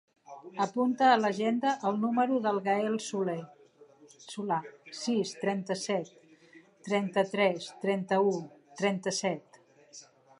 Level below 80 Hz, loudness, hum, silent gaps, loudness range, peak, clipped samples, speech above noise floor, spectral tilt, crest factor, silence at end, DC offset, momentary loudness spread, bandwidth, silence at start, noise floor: -82 dBFS; -30 LUFS; none; none; 6 LU; -12 dBFS; under 0.1%; 29 dB; -5 dB/octave; 18 dB; 0.4 s; under 0.1%; 18 LU; 11.5 kHz; 0.3 s; -58 dBFS